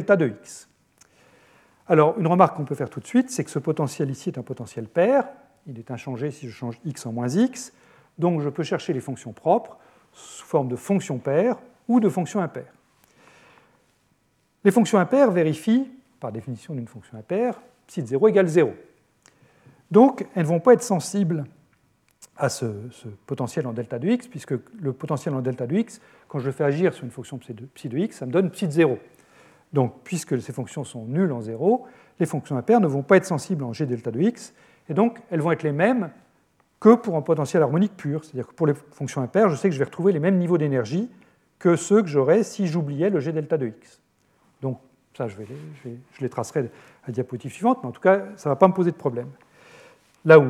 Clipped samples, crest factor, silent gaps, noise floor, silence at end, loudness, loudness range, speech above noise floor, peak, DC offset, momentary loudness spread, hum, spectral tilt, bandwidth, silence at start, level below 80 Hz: under 0.1%; 22 dB; none; -67 dBFS; 0 s; -23 LUFS; 6 LU; 45 dB; 0 dBFS; under 0.1%; 16 LU; none; -7 dB/octave; 14 kHz; 0 s; -76 dBFS